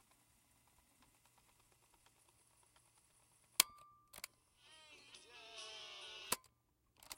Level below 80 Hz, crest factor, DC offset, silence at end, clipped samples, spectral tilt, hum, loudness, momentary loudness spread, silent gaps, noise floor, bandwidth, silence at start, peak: -82 dBFS; 42 dB; under 0.1%; 0 s; under 0.1%; 1 dB/octave; none; -41 LUFS; 25 LU; none; -79 dBFS; 16 kHz; 3.6 s; -8 dBFS